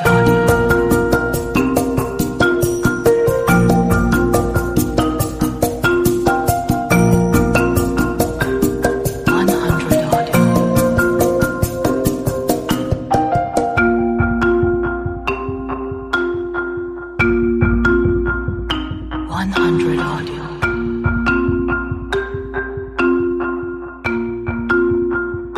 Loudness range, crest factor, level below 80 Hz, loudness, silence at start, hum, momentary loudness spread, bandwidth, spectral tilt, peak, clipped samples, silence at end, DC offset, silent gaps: 4 LU; 14 dB; -30 dBFS; -17 LUFS; 0 s; none; 9 LU; 15.5 kHz; -6 dB/octave; -2 dBFS; under 0.1%; 0 s; under 0.1%; none